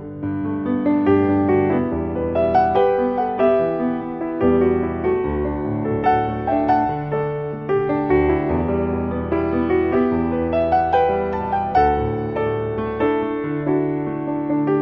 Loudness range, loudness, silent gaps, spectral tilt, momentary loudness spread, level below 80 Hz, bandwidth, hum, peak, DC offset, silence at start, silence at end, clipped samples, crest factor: 2 LU; -20 LUFS; none; -10.5 dB/octave; 6 LU; -38 dBFS; 5.8 kHz; none; -4 dBFS; under 0.1%; 0 s; 0 s; under 0.1%; 14 dB